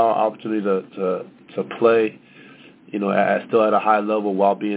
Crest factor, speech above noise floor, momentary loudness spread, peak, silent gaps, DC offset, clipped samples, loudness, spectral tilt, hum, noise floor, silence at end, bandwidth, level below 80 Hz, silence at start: 18 dB; 26 dB; 12 LU; -2 dBFS; none; under 0.1%; under 0.1%; -20 LUFS; -10 dB/octave; none; -46 dBFS; 0 s; 4 kHz; -70 dBFS; 0 s